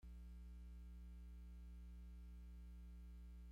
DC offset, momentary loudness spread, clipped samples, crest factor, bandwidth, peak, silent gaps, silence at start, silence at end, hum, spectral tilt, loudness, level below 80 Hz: under 0.1%; 1 LU; under 0.1%; 6 dB; 14 kHz; -50 dBFS; none; 0 s; 0 s; 60 Hz at -55 dBFS; -7.5 dB/octave; -60 LUFS; -56 dBFS